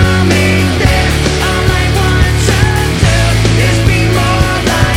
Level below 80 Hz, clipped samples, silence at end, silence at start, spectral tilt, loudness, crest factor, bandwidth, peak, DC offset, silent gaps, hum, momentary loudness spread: -16 dBFS; under 0.1%; 0 s; 0 s; -5 dB/octave; -10 LUFS; 10 dB; 16 kHz; 0 dBFS; under 0.1%; none; none; 2 LU